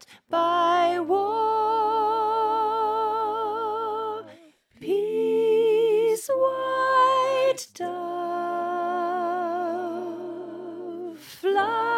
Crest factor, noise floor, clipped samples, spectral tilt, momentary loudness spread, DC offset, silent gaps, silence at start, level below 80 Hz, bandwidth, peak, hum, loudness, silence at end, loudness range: 14 dB; -53 dBFS; under 0.1%; -3.5 dB/octave; 14 LU; under 0.1%; none; 0.1 s; -82 dBFS; 16 kHz; -10 dBFS; none; -24 LUFS; 0 s; 6 LU